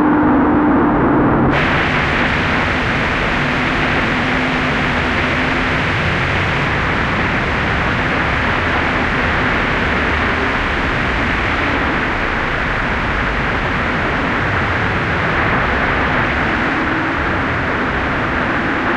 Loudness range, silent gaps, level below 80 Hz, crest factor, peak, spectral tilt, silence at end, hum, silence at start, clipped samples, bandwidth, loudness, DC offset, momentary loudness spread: 2 LU; none; -28 dBFS; 12 dB; -2 dBFS; -6 dB/octave; 0 s; none; 0 s; under 0.1%; 11 kHz; -15 LUFS; under 0.1%; 4 LU